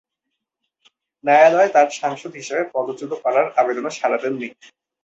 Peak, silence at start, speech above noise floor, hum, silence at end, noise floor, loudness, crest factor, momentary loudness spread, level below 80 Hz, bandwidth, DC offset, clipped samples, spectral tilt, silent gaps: -2 dBFS; 1.25 s; 61 dB; none; 0.55 s; -80 dBFS; -19 LUFS; 18 dB; 14 LU; -74 dBFS; 8 kHz; under 0.1%; under 0.1%; -4 dB/octave; none